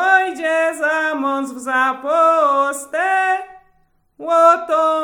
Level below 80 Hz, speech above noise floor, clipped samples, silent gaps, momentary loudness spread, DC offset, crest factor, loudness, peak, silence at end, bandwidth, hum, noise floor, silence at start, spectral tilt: -66 dBFS; 43 dB; under 0.1%; none; 8 LU; under 0.1%; 16 dB; -16 LUFS; 0 dBFS; 0 s; 17.5 kHz; none; -59 dBFS; 0 s; -1.5 dB/octave